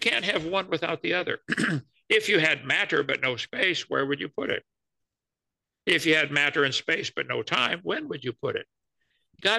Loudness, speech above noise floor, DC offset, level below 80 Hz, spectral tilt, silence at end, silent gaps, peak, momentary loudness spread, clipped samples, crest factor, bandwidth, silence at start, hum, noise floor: -25 LUFS; 62 dB; under 0.1%; -68 dBFS; -3.5 dB/octave; 0 s; none; -8 dBFS; 10 LU; under 0.1%; 20 dB; 12.5 kHz; 0 s; none; -88 dBFS